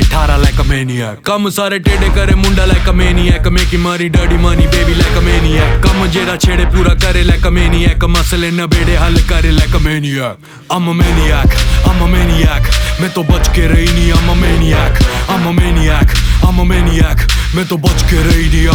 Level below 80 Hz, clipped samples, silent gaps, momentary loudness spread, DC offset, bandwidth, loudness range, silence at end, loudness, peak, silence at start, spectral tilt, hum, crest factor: -12 dBFS; under 0.1%; none; 3 LU; under 0.1%; 18 kHz; 1 LU; 0 s; -11 LUFS; 0 dBFS; 0 s; -5.5 dB/octave; none; 10 dB